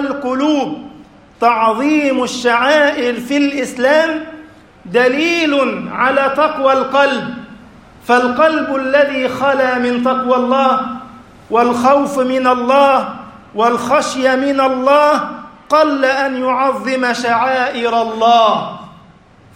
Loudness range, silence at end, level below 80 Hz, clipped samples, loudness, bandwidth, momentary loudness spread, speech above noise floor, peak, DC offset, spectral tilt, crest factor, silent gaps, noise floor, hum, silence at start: 1 LU; 0.65 s; -54 dBFS; under 0.1%; -14 LUFS; 16 kHz; 8 LU; 31 dB; 0 dBFS; under 0.1%; -4 dB/octave; 14 dB; none; -44 dBFS; none; 0 s